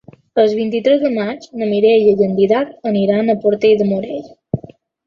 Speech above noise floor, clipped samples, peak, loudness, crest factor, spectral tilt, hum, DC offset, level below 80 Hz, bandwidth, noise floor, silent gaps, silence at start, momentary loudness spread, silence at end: 26 dB; under 0.1%; -2 dBFS; -15 LUFS; 14 dB; -7.5 dB/octave; none; under 0.1%; -54 dBFS; 6.8 kHz; -40 dBFS; none; 0.35 s; 14 LU; 0.45 s